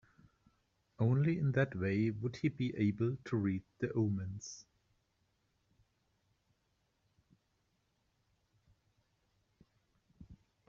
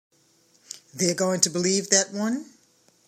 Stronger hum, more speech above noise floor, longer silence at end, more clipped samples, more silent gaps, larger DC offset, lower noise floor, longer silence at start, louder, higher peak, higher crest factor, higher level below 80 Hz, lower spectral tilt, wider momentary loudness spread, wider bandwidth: neither; first, 45 dB vs 38 dB; second, 0.35 s vs 0.65 s; neither; neither; neither; first, -80 dBFS vs -62 dBFS; first, 1 s vs 0.7 s; second, -36 LUFS vs -23 LUFS; second, -20 dBFS vs -2 dBFS; second, 20 dB vs 26 dB; about the same, -70 dBFS vs -74 dBFS; first, -8 dB/octave vs -2.5 dB/octave; second, 10 LU vs 20 LU; second, 7.4 kHz vs 16 kHz